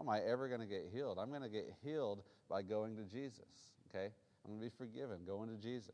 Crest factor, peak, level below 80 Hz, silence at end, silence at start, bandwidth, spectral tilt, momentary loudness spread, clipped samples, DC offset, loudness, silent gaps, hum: 18 dB; -26 dBFS; -84 dBFS; 0 s; 0 s; 10 kHz; -6.5 dB/octave; 11 LU; under 0.1%; under 0.1%; -46 LUFS; none; none